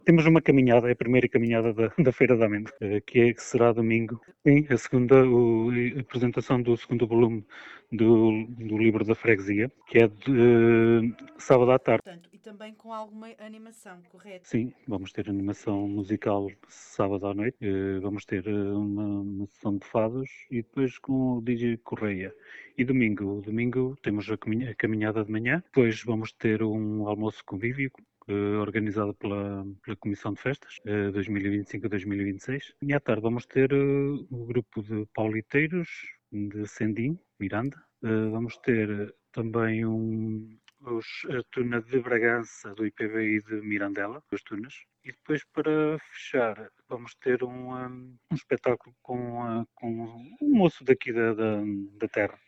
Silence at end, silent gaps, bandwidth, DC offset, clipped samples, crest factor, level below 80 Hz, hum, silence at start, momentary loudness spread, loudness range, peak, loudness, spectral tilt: 0.15 s; none; 8.2 kHz; under 0.1%; under 0.1%; 20 dB; -58 dBFS; none; 0.05 s; 15 LU; 9 LU; -6 dBFS; -27 LUFS; -8 dB/octave